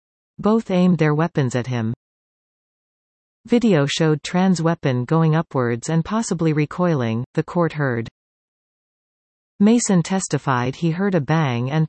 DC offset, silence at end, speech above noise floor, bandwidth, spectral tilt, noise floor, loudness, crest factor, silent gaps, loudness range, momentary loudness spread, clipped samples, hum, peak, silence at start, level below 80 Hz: under 0.1%; 0 s; over 71 dB; 8.8 kHz; -6 dB/octave; under -90 dBFS; -20 LUFS; 16 dB; 1.96-3.44 s, 7.26-7.34 s, 8.11-9.59 s; 3 LU; 6 LU; under 0.1%; none; -4 dBFS; 0.4 s; -56 dBFS